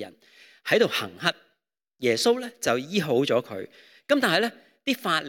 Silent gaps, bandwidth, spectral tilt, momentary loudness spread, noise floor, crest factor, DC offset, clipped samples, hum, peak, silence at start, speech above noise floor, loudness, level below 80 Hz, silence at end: none; 17.5 kHz; -4 dB/octave; 16 LU; -76 dBFS; 22 dB; under 0.1%; under 0.1%; none; -4 dBFS; 0 s; 51 dB; -25 LUFS; -74 dBFS; 0 s